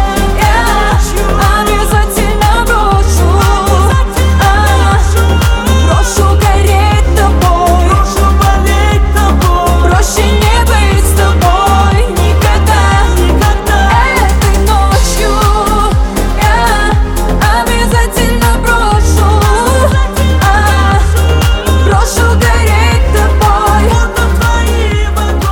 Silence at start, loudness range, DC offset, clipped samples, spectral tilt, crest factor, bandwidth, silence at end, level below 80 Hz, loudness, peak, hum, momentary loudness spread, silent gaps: 0 s; 1 LU; 0.1%; under 0.1%; -5 dB/octave; 8 dB; 19 kHz; 0 s; -12 dBFS; -9 LUFS; 0 dBFS; none; 3 LU; none